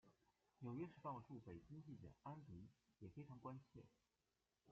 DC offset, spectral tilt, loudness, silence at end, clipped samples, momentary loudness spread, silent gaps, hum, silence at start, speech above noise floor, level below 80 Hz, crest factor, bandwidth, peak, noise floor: under 0.1%; -8.5 dB/octave; -58 LUFS; 0 s; under 0.1%; 11 LU; none; none; 0.05 s; over 33 dB; -82 dBFS; 18 dB; 7.2 kHz; -40 dBFS; under -90 dBFS